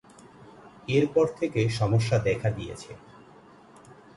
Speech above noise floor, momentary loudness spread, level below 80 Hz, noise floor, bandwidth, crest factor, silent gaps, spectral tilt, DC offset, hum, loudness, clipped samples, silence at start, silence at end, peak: 27 dB; 19 LU; -52 dBFS; -52 dBFS; 11.5 kHz; 18 dB; none; -6.5 dB/octave; under 0.1%; none; -26 LUFS; under 0.1%; 0.65 s; 1.2 s; -10 dBFS